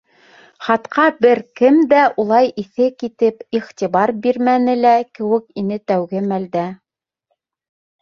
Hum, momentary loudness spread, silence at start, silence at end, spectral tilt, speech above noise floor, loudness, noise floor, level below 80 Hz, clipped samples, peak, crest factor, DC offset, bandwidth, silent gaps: none; 10 LU; 0.6 s; 1.25 s; -7 dB/octave; 59 dB; -16 LUFS; -74 dBFS; -64 dBFS; under 0.1%; -2 dBFS; 16 dB; under 0.1%; 7 kHz; none